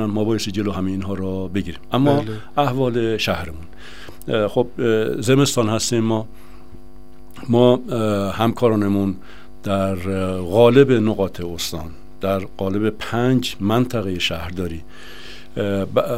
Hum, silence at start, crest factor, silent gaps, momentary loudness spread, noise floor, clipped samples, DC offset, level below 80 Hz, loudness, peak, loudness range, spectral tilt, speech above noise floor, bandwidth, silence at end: none; 0 s; 20 dB; none; 17 LU; -44 dBFS; under 0.1%; 2%; -46 dBFS; -20 LUFS; 0 dBFS; 4 LU; -6 dB/octave; 25 dB; 16 kHz; 0 s